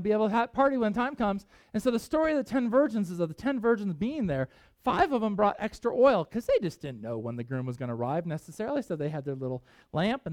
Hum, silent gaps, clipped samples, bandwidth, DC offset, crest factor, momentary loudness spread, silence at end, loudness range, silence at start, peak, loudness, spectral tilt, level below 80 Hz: none; none; under 0.1%; 16 kHz; under 0.1%; 18 dB; 10 LU; 0 s; 5 LU; 0 s; -10 dBFS; -29 LUFS; -7 dB/octave; -56 dBFS